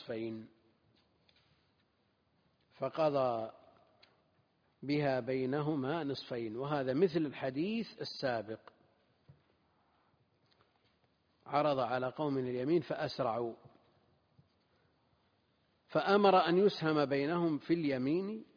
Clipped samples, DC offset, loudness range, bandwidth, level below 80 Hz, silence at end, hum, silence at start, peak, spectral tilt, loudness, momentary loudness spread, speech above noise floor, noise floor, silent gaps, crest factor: under 0.1%; under 0.1%; 10 LU; 5.2 kHz; -76 dBFS; 0.15 s; none; 0 s; -14 dBFS; -5 dB/octave; -34 LUFS; 12 LU; 42 dB; -76 dBFS; none; 22 dB